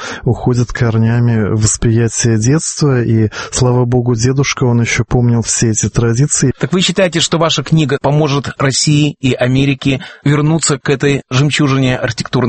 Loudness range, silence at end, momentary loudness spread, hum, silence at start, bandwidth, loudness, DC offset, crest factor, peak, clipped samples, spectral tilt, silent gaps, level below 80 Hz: 1 LU; 0 s; 3 LU; none; 0 s; 8.8 kHz; -13 LUFS; under 0.1%; 12 dB; 0 dBFS; under 0.1%; -5 dB/octave; none; -34 dBFS